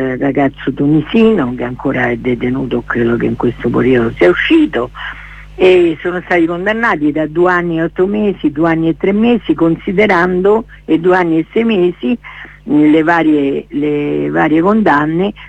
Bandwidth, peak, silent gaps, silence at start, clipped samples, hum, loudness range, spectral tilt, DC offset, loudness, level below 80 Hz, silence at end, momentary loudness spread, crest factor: 8.2 kHz; 0 dBFS; none; 0 s; under 0.1%; none; 2 LU; -8 dB/octave; under 0.1%; -12 LUFS; -38 dBFS; 0 s; 7 LU; 12 dB